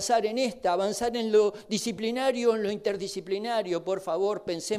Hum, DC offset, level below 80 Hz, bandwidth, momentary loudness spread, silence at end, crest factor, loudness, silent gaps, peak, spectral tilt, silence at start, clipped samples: none; under 0.1%; -64 dBFS; 15 kHz; 7 LU; 0 s; 14 dB; -28 LUFS; none; -12 dBFS; -3.5 dB/octave; 0 s; under 0.1%